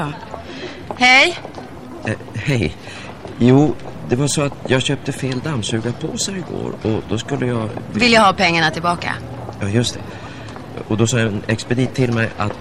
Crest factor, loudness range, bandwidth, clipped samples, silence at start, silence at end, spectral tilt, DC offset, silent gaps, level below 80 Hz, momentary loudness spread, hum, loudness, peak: 18 dB; 4 LU; 14.5 kHz; under 0.1%; 0 s; 0 s; -4.5 dB/octave; 0.6%; none; -44 dBFS; 20 LU; none; -17 LUFS; 0 dBFS